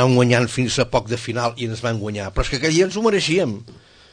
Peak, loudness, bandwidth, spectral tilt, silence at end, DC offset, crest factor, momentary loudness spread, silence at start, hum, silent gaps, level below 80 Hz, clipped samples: -2 dBFS; -20 LUFS; 9.8 kHz; -5 dB/octave; 0.35 s; under 0.1%; 18 dB; 9 LU; 0 s; none; none; -36 dBFS; under 0.1%